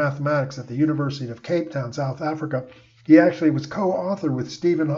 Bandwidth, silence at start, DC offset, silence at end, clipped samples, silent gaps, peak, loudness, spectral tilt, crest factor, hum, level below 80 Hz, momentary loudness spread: 7.2 kHz; 0 s; under 0.1%; 0 s; under 0.1%; none; -2 dBFS; -22 LUFS; -7.5 dB/octave; 20 dB; none; -62 dBFS; 13 LU